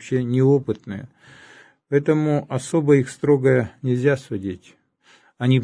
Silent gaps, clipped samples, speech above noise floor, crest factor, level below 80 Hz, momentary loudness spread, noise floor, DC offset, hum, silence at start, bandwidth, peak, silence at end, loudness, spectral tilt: none; under 0.1%; 36 dB; 16 dB; -60 dBFS; 12 LU; -56 dBFS; under 0.1%; none; 0 s; 10.5 kHz; -4 dBFS; 0 s; -20 LUFS; -7.5 dB/octave